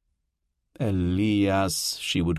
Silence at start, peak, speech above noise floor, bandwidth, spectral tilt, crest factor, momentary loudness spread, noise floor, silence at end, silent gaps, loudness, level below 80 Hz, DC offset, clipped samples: 0.8 s; -14 dBFS; 54 dB; 14 kHz; -5 dB/octave; 12 dB; 5 LU; -78 dBFS; 0 s; none; -25 LUFS; -42 dBFS; under 0.1%; under 0.1%